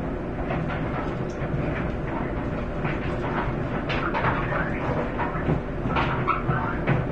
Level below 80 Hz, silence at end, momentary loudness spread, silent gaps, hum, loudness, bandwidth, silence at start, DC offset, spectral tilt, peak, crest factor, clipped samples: -36 dBFS; 0 s; 5 LU; none; none; -27 LUFS; 8 kHz; 0 s; 0.6%; -8 dB/octave; -10 dBFS; 18 dB; under 0.1%